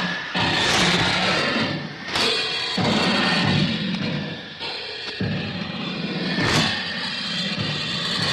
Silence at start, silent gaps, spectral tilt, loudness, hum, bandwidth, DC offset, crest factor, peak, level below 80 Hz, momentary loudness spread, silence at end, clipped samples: 0 s; none; -4 dB/octave; -22 LUFS; none; 13.5 kHz; under 0.1%; 16 dB; -8 dBFS; -48 dBFS; 10 LU; 0 s; under 0.1%